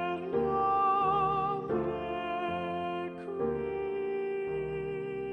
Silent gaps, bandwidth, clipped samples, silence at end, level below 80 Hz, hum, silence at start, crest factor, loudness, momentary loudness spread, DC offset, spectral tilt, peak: none; 5.4 kHz; under 0.1%; 0 s; -56 dBFS; none; 0 s; 14 dB; -32 LUFS; 9 LU; under 0.1%; -8 dB/octave; -18 dBFS